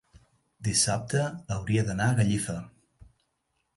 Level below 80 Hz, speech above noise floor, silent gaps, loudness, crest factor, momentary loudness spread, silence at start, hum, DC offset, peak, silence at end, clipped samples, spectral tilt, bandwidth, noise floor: -52 dBFS; 50 dB; none; -27 LUFS; 18 dB; 10 LU; 0.6 s; none; under 0.1%; -12 dBFS; 1.05 s; under 0.1%; -4.5 dB/octave; 11.5 kHz; -77 dBFS